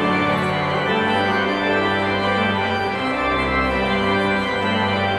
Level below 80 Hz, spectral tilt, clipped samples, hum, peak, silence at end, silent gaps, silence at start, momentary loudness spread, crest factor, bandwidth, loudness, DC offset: -40 dBFS; -6 dB/octave; under 0.1%; none; -6 dBFS; 0 s; none; 0 s; 2 LU; 12 dB; 12.5 kHz; -19 LUFS; under 0.1%